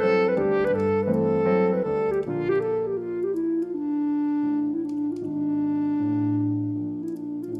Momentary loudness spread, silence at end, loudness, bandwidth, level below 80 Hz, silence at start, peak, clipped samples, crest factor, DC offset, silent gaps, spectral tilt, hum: 7 LU; 0 s; -25 LUFS; 5.6 kHz; -60 dBFS; 0 s; -10 dBFS; under 0.1%; 14 dB; under 0.1%; none; -9.5 dB/octave; none